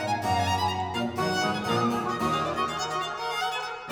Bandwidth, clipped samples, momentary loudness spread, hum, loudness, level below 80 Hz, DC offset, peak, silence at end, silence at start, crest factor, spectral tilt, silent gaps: over 20 kHz; under 0.1%; 4 LU; none; -27 LUFS; -56 dBFS; under 0.1%; -14 dBFS; 0 s; 0 s; 14 dB; -4.5 dB/octave; none